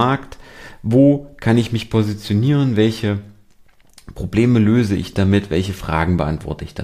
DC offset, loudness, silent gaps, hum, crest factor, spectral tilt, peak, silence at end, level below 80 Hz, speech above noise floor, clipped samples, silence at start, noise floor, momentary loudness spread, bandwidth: under 0.1%; -17 LUFS; none; none; 16 dB; -7.5 dB/octave; 0 dBFS; 0 s; -38 dBFS; 32 dB; under 0.1%; 0 s; -49 dBFS; 11 LU; 14.5 kHz